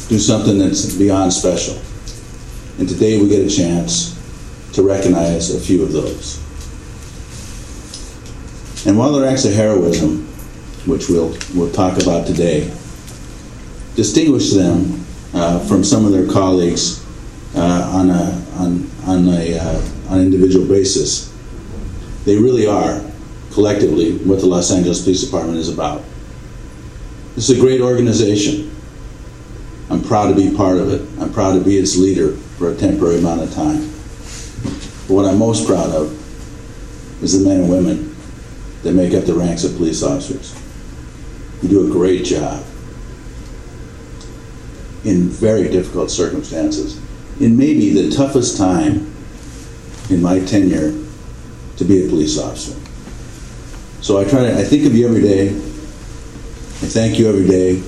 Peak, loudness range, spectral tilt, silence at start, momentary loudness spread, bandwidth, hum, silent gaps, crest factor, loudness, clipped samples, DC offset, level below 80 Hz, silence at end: 0 dBFS; 4 LU; -5.5 dB/octave; 0 s; 21 LU; 13 kHz; none; none; 16 dB; -15 LUFS; under 0.1%; under 0.1%; -32 dBFS; 0 s